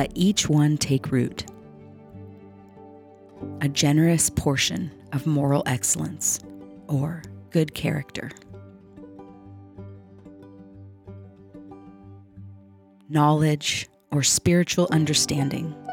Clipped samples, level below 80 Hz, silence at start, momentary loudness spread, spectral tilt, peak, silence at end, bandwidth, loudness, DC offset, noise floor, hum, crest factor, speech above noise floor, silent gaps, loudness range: under 0.1%; -52 dBFS; 0 s; 25 LU; -4.5 dB/octave; -8 dBFS; 0 s; 18 kHz; -23 LUFS; under 0.1%; -52 dBFS; none; 18 dB; 29 dB; none; 23 LU